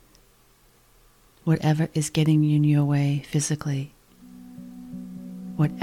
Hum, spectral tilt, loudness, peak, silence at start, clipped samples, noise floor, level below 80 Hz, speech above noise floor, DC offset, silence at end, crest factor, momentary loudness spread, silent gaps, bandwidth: none; -6.5 dB/octave; -23 LUFS; -10 dBFS; 1.45 s; under 0.1%; -58 dBFS; -58 dBFS; 36 dB; under 0.1%; 0 s; 16 dB; 20 LU; none; 13 kHz